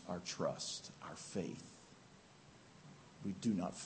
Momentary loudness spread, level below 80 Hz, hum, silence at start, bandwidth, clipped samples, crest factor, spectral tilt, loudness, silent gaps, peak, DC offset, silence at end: 22 LU; -76 dBFS; none; 0 s; 8.4 kHz; under 0.1%; 22 dB; -4.5 dB/octave; -43 LUFS; none; -24 dBFS; under 0.1%; 0 s